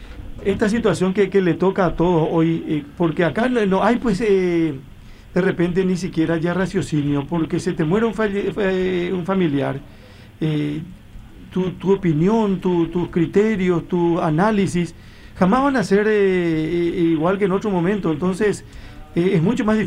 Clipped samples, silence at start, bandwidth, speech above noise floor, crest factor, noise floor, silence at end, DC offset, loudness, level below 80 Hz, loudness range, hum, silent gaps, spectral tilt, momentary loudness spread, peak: under 0.1%; 0 s; 11.5 kHz; 20 dB; 16 dB; -39 dBFS; 0 s; under 0.1%; -19 LUFS; -42 dBFS; 4 LU; none; none; -7.5 dB/octave; 7 LU; -4 dBFS